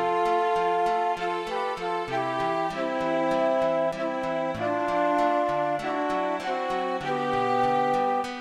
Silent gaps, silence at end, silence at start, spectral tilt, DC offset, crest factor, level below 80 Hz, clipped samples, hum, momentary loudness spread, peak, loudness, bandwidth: none; 0 s; 0 s; -5.5 dB/octave; under 0.1%; 12 dB; -58 dBFS; under 0.1%; none; 5 LU; -14 dBFS; -26 LUFS; 12.5 kHz